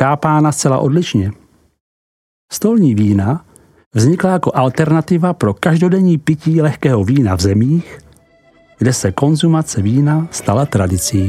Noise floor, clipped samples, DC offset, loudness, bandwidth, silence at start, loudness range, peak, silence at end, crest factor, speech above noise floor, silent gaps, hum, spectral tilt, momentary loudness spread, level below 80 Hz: -49 dBFS; under 0.1%; under 0.1%; -14 LUFS; 14.5 kHz; 0 s; 3 LU; 0 dBFS; 0 s; 14 dB; 37 dB; 1.80-2.48 s, 3.86-3.91 s; none; -6.5 dB/octave; 6 LU; -44 dBFS